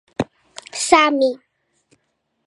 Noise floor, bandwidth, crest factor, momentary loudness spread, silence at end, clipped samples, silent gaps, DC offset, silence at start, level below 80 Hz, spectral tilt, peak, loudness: -71 dBFS; 11.5 kHz; 20 dB; 21 LU; 1.1 s; under 0.1%; none; under 0.1%; 0.2 s; -54 dBFS; -3 dB/octave; 0 dBFS; -17 LUFS